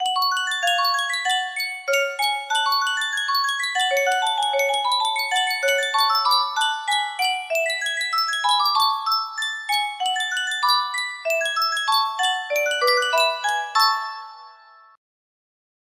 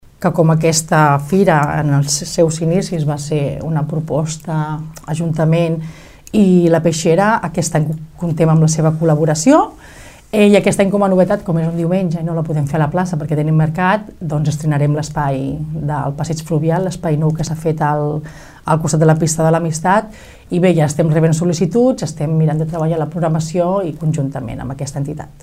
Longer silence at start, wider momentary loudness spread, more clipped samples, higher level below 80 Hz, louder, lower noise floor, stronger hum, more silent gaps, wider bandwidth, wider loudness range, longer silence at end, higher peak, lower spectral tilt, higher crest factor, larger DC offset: second, 0 s vs 0.2 s; second, 5 LU vs 10 LU; neither; second, -76 dBFS vs -42 dBFS; second, -21 LUFS vs -15 LUFS; first, -49 dBFS vs -38 dBFS; neither; neither; first, 16 kHz vs 14.5 kHz; about the same, 2 LU vs 4 LU; first, 1.4 s vs 0.1 s; second, -6 dBFS vs 0 dBFS; second, 3.5 dB/octave vs -6.5 dB/octave; about the same, 16 dB vs 14 dB; neither